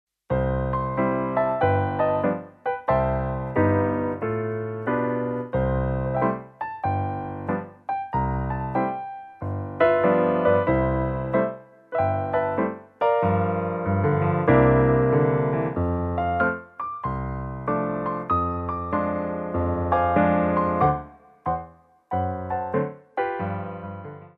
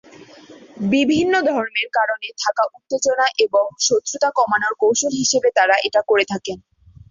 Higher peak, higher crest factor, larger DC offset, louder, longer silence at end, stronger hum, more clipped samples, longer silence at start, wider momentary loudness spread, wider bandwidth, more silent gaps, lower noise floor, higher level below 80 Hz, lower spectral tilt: second, -6 dBFS vs -2 dBFS; about the same, 18 dB vs 16 dB; neither; second, -24 LUFS vs -18 LUFS; second, 0.1 s vs 0.5 s; neither; neither; second, 0.3 s vs 0.5 s; first, 11 LU vs 7 LU; second, 4.5 kHz vs 7.8 kHz; neither; first, -47 dBFS vs -43 dBFS; first, -40 dBFS vs -58 dBFS; first, -11 dB/octave vs -2.5 dB/octave